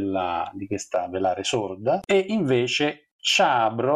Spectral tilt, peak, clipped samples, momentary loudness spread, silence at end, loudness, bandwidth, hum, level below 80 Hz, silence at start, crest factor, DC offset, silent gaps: -4 dB/octave; -8 dBFS; under 0.1%; 8 LU; 0 s; -23 LUFS; 13 kHz; none; -64 dBFS; 0 s; 14 dB; under 0.1%; 3.12-3.19 s